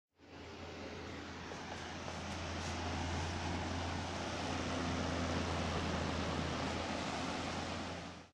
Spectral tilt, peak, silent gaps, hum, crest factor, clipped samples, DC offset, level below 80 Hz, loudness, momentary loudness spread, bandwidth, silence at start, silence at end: -4.5 dB/octave; -26 dBFS; none; none; 16 dB; under 0.1%; under 0.1%; -54 dBFS; -40 LUFS; 9 LU; 11 kHz; 0.2 s; 0.05 s